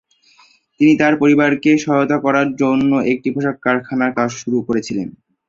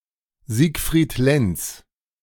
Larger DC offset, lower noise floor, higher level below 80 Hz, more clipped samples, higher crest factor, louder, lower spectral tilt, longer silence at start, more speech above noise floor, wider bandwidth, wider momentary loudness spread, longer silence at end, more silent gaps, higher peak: neither; first, -52 dBFS vs -45 dBFS; second, -56 dBFS vs -38 dBFS; neither; about the same, 14 dB vs 18 dB; first, -16 LUFS vs -21 LUFS; about the same, -6 dB/octave vs -5.5 dB/octave; first, 0.8 s vs 0.5 s; first, 37 dB vs 25 dB; second, 7.6 kHz vs 18.5 kHz; about the same, 8 LU vs 10 LU; about the same, 0.4 s vs 0.45 s; neither; about the same, -2 dBFS vs -4 dBFS